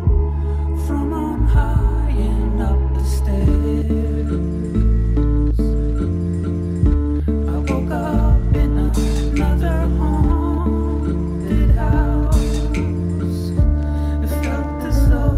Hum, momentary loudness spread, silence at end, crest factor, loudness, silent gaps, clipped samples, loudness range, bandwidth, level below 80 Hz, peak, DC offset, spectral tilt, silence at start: none; 4 LU; 0 s; 12 dB; -19 LUFS; none; under 0.1%; 1 LU; 13.5 kHz; -18 dBFS; -6 dBFS; under 0.1%; -8 dB/octave; 0 s